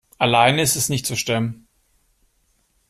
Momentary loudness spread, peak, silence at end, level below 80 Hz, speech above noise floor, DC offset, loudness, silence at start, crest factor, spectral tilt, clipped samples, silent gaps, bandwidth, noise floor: 8 LU; -2 dBFS; 1.35 s; -54 dBFS; 46 dB; under 0.1%; -19 LUFS; 0.2 s; 20 dB; -3.5 dB/octave; under 0.1%; none; 15.5 kHz; -65 dBFS